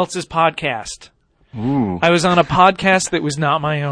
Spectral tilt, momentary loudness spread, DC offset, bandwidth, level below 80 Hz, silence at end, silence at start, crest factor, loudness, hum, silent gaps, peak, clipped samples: -4.5 dB/octave; 14 LU; under 0.1%; 10.5 kHz; -46 dBFS; 0 s; 0 s; 16 dB; -16 LUFS; none; none; 0 dBFS; under 0.1%